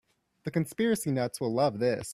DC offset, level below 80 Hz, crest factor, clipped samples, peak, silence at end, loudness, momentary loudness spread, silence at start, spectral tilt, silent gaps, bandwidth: under 0.1%; -66 dBFS; 16 dB; under 0.1%; -14 dBFS; 0 s; -29 LUFS; 6 LU; 0.45 s; -5.5 dB/octave; none; 16 kHz